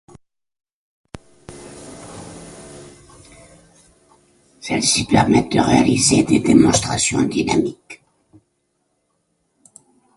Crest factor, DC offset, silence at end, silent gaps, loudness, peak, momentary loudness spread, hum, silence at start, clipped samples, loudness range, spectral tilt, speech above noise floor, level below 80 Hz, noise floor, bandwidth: 20 dB; under 0.1%; 2.2 s; none; -16 LUFS; 0 dBFS; 25 LU; none; 1.5 s; under 0.1%; 9 LU; -4 dB/octave; 53 dB; -44 dBFS; -69 dBFS; 11.5 kHz